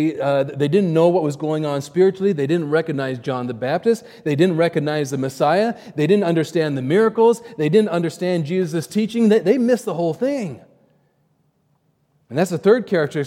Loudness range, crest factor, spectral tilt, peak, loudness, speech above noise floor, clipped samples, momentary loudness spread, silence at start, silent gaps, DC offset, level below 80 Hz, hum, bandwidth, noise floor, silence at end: 3 LU; 16 dB; -7 dB/octave; -2 dBFS; -19 LUFS; 46 dB; under 0.1%; 7 LU; 0 s; none; under 0.1%; -70 dBFS; none; 16 kHz; -64 dBFS; 0 s